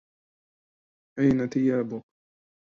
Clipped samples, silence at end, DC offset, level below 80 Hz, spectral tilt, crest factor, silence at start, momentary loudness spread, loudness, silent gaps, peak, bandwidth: under 0.1%; 0.7 s; under 0.1%; -58 dBFS; -8.5 dB/octave; 20 dB; 1.15 s; 16 LU; -25 LUFS; none; -10 dBFS; 7 kHz